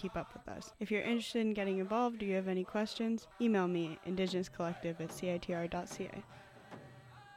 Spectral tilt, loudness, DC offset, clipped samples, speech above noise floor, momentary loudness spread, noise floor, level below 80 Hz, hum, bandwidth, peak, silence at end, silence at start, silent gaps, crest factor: -6 dB/octave; -37 LUFS; under 0.1%; under 0.1%; 19 dB; 19 LU; -56 dBFS; -66 dBFS; none; 15 kHz; -22 dBFS; 0 s; 0 s; none; 16 dB